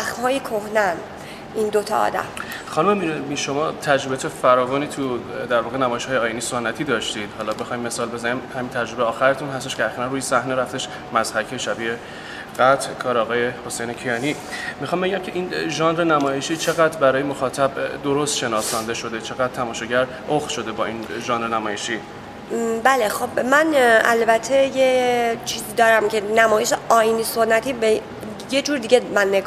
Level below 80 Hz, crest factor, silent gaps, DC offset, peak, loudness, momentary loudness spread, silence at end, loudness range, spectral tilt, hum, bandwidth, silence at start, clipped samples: -54 dBFS; 20 dB; none; under 0.1%; 0 dBFS; -21 LUFS; 10 LU; 0 s; 6 LU; -3.5 dB/octave; none; 16 kHz; 0 s; under 0.1%